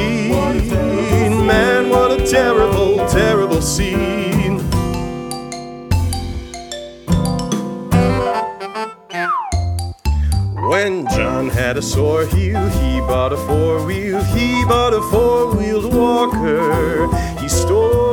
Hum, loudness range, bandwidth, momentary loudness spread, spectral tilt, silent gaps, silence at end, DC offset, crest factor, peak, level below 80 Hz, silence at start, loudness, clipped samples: none; 6 LU; 19 kHz; 10 LU; -5.5 dB/octave; none; 0 s; under 0.1%; 16 dB; 0 dBFS; -26 dBFS; 0 s; -16 LUFS; under 0.1%